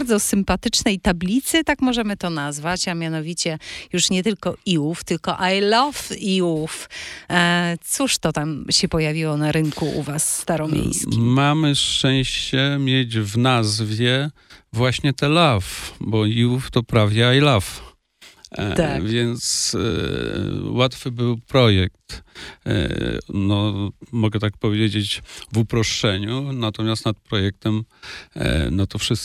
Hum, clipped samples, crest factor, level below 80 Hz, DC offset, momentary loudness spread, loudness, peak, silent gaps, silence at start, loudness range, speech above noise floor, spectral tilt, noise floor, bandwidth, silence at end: none; under 0.1%; 18 dB; -40 dBFS; under 0.1%; 9 LU; -20 LUFS; -2 dBFS; none; 0 s; 4 LU; 29 dB; -4.5 dB/octave; -50 dBFS; 15.5 kHz; 0 s